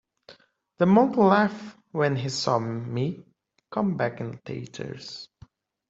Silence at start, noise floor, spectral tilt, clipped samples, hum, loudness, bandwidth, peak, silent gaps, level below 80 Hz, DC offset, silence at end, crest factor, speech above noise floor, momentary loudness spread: 0.3 s; -57 dBFS; -6.5 dB/octave; under 0.1%; none; -25 LUFS; 8 kHz; -6 dBFS; none; -64 dBFS; under 0.1%; 0.65 s; 22 dB; 32 dB; 19 LU